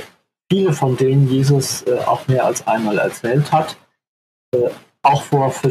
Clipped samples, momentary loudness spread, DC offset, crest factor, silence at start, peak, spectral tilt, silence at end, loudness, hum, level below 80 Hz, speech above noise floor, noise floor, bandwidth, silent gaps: under 0.1%; 5 LU; under 0.1%; 16 dB; 0 s; 0 dBFS; -6 dB/octave; 0 s; -17 LUFS; none; -62 dBFS; 26 dB; -42 dBFS; 14 kHz; 4.07-4.52 s